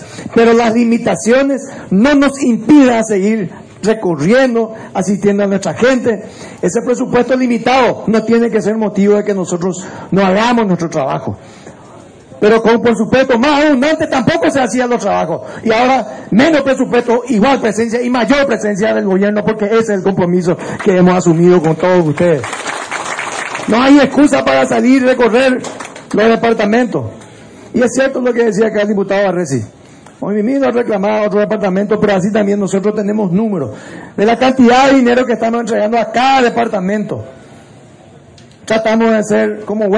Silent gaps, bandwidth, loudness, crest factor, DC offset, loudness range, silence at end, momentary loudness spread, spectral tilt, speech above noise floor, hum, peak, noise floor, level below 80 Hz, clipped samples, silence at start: none; 10.5 kHz; -12 LUFS; 12 dB; under 0.1%; 3 LU; 0 s; 10 LU; -5.5 dB/octave; 28 dB; none; 0 dBFS; -39 dBFS; -46 dBFS; under 0.1%; 0 s